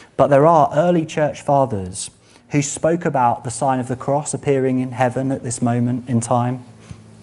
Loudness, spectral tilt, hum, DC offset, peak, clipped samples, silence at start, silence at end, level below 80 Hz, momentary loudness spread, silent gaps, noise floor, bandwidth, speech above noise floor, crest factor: -18 LUFS; -6 dB/octave; none; under 0.1%; 0 dBFS; under 0.1%; 0.2 s; 0.2 s; -54 dBFS; 10 LU; none; -40 dBFS; 11.5 kHz; 22 dB; 18 dB